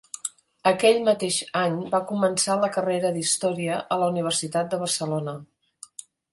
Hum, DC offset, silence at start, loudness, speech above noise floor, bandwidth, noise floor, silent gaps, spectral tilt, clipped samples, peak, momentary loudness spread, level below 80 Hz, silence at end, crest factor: none; under 0.1%; 0.25 s; -24 LUFS; 22 dB; 12 kHz; -45 dBFS; none; -3.5 dB/octave; under 0.1%; -6 dBFS; 14 LU; -70 dBFS; 0.9 s; 18 dB